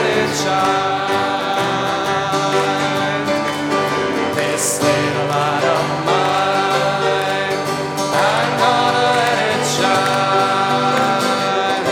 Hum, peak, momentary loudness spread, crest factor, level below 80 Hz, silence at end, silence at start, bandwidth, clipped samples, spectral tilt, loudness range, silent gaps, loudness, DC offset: none; -2 dBFS; 4 LU; 16 dB; -58 dBFS; 0 s; 0 s; 17.5 kHz; under 0.1%; -3.5 dB/octave; 2 LU; none; -16 LUFS; under 0.1%